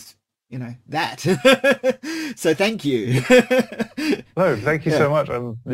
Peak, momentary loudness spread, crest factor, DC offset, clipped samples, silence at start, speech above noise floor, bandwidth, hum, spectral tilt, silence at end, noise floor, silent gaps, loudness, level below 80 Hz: -2 dBFS; 13 LU; 18 dB; under 0.1%; under 0.1%; 0 s; 30 dB; 16 kHz; none; -5 dB/octave; 0 s; -50 dBFS; none; -19 LUFS; -56 dBFS